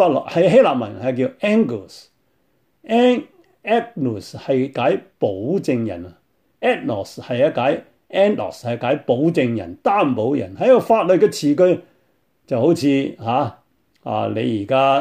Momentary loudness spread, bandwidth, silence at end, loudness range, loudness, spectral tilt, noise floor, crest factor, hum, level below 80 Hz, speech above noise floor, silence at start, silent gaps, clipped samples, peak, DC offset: 11 LU; 15 kHz; 0 s; 5 LU; -19 LUFS; -6.5 dB/octave; -65 dBFS; 16 dB; none; -62 dBFS; 47 dB; 0 s; none; under 0.1%; -2 dBFS; under 0.1%